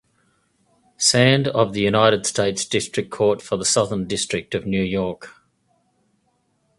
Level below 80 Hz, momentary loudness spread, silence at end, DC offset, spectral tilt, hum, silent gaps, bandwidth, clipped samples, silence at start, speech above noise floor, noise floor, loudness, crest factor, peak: -52 dBFS; 9 LU; 1.5 s; under 0.1%; -3.5 dB/octave; none; none; 11.5 kHz; under 0.1%; 1 s; 47 dB; -67 dBFS; -20 LUFS; 22 dB; 0 dBFS